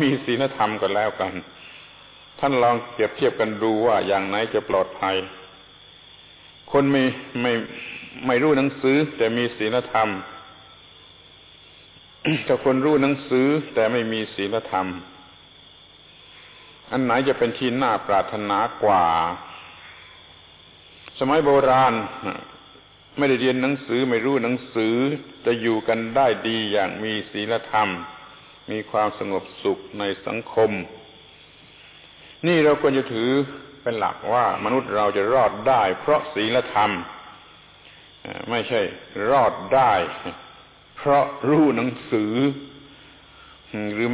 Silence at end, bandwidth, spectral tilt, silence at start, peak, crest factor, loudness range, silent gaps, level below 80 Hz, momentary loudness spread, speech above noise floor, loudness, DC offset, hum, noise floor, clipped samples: 0 s; 4 kHz; -9.5 dB/octave; 0 s; -8 dBFS; 16 dB; 5 LU; none; -56 dBFS; 15 LU; 28 dB; -22 LUFS; under 0.1%; 50 Hz at -60 dBFS; -49 dBFS; under 0.1%